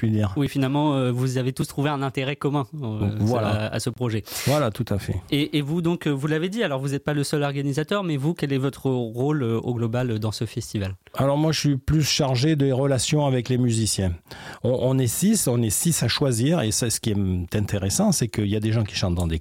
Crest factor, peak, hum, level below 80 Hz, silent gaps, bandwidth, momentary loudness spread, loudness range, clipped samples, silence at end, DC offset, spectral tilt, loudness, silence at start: 12 dB; -10 dBFS; none; -46 dBFS; none; 16.5 kHz; 6 LU; 3 LU; under 0.1%; 0 s; under 0.1%; -5 dB/octave; -23 LUFS; 0 s